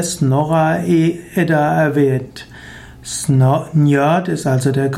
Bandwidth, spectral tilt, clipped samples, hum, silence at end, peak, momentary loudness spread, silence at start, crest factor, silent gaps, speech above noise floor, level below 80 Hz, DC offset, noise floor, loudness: 15.5 kHz; -6.5 dB/octave; under 0.1%; none; 0 s; -4 dBFS; 19 LU; 0 s; 12 dB; none; 21 dB; -48 dBFS; under 0.1%; -36 dBFS; -15 LUFS